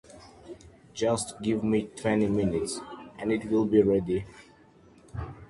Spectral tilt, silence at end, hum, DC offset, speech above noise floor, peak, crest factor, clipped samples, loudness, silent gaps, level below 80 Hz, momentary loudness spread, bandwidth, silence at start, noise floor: -6 dB/octave; 0.05 s; none; under 0.1%; 29 dB; -8 dBFS; 20 dB; under 0.1%; -27 LUFS; none; -52 dBFS; 23 LU; 11.5 kHz; 0.1 s; -56 dBFS